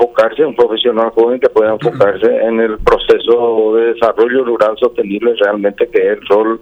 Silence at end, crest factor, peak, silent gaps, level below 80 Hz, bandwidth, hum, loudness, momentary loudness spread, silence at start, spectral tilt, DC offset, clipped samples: 0.05 s; 12 dB; 0 dBFS; none; -38 dBFS; 6.6 kHz; none; -12 LUFS; 3 LU; 0 s; -6.5 dB/octave; under 0.1%; under 0.1%